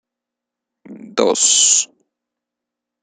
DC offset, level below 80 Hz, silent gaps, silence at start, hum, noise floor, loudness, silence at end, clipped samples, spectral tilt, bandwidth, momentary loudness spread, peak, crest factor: under 0.1%; -66 dBFS; none; 0.9 s; none; -84 dBFS; -13 LUFS; 1.2 s; under 0.1%; 0 dB/octave; 10.5 kHz; 15 LU; -2 dBFS; 18 dB